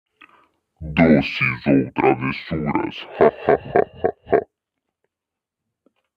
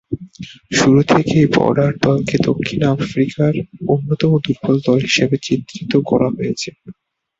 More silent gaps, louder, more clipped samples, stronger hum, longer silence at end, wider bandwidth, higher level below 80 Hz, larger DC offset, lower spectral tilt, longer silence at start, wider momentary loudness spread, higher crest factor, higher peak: neither; second, -19 LUFS vs -16 LUFS; neither; neither; first, 1.75 s vs 0.45 s; second, 6.4 kHz vs 7.8 kHz; about the same, -46 dBFS vs -46 dBFS; neither; first, -8.5 dB/octave vs -6 dB/octave; first, 0.8 s vs 0.1 s; about the same, 10 LU vs 9 LU; about the same, 20 dB vs 16 dB; about the same, -2 dBFS vs 0 dBFS